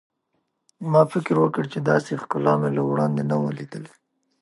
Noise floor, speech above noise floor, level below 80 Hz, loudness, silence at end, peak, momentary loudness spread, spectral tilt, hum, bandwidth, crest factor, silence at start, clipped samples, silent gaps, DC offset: -74 dBFS; 52 dB; -66 dBFS; -22 LUFS; 0.55 s; -4 dBFS; 14 LU; -8 dB/octave; none; 11.5 kHz; 20 dB; 0.8 s; under 0.1%; none; under 0.1%